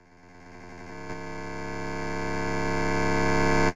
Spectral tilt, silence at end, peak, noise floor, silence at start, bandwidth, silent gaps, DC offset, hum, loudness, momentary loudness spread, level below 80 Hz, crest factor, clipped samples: -5.5 dB/octave; 0 s; -12 dBFS; -51 dBFS; 0 s; 12 kHz; none; under 0.1%; none; -28 LUFS; 20 LU; -42 dBFS; 16 dB; under 0.1%